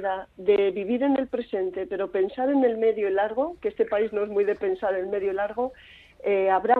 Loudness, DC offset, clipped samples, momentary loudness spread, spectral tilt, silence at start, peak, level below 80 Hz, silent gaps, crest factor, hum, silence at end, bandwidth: -25 LUFS; under 0.1%; under 0.1%; 7 LU; -8 dB/octave; 0 s; -6 dBFS; -60 dBFS; none; 18 dB; none; 0 s; 4.4 kHz